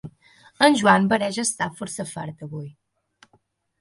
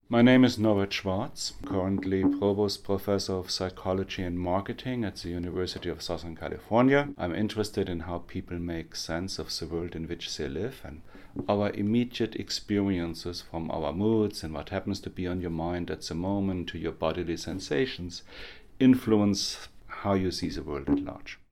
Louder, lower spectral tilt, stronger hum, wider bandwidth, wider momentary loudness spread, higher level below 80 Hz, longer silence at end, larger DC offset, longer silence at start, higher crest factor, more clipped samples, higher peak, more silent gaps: first, -21 LUFS vs -29 LUFS; second, -4 dB/octave vs -5.5 dB/octave; neither; second, 11.5 kHz vs 15.5 kHz; first, 18 LU vs 13 LU; second, -64 dBFS vs -50 dBFS; first, 1.1 s vs 0.15 s; neither; about the same, 0.05 s vs 0.1 s; about the same, 22 dB vs 20 dB; neither; first, -2 dBFS vs -10 dBFS; neither